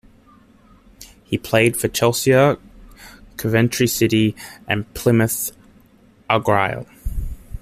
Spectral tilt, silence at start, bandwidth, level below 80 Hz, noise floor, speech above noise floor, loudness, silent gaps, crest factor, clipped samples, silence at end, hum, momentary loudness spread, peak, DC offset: -5 dB/octave; 1 s; 15.5 kHz; -38 dBFS; -52 dBFS; 34 dB; -19 LUFS; none; 18 dB; under 0.1%; 0 s; none; 15 LU; -2 dBFS; under 0.1%